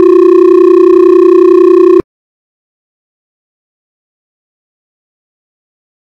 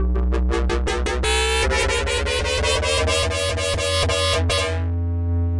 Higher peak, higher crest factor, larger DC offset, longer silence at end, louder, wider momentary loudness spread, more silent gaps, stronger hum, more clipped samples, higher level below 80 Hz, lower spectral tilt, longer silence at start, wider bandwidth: first, 0 dBFS vs -12 dBFS; about the same, 8 dB vs 8 dB; neither; first, 4 s vs 0 s; first, -5 LUFS vs -20 LUFS; second, 1 LU vs 4 LU; neither; neither; first, 5% vs under 0.1%; second, -50 dBFS vs -26 dBFS; first, -7.5 dB/octave vs -3.5 dB/octave; about the same, 0 s vs 0 s; second, 5.6 kHz vs 11.5 kHz